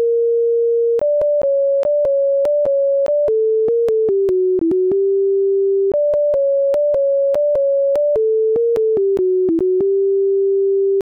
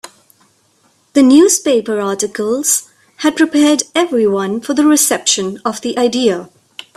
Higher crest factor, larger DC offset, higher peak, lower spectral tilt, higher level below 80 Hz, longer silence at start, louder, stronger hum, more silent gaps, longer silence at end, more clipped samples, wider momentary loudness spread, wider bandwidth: second, 4 dB vs 14 dB; neither; second, -12 dBFS vs 0 dBFS; first, -8.5 dB/octave vs -2.5 dB/octave; about the same, -54 dBFS vs -58 dBFS; second, 0 s vs 1.15 s; second, -16 LUFS vs -13 LUFS; neither; neither; second, 0.1 s vs 0.5 s; neither; second, 0 LU vs 9 LU; second, 3.8 kHz vs 15 kHz